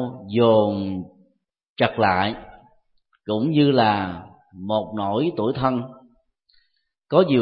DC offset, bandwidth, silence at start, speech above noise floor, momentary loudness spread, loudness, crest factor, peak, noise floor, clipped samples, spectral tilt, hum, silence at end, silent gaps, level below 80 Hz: under 0.1%; 5.2 kHz; 0 s; 51 dB; 20 LU; -21 LUFS; 20 dB; -2 dBFS; -71 dBFS; under 0.1%; -11.5 dB/octave; none; 0 s; 1.69-1.76 s; -56 dBFS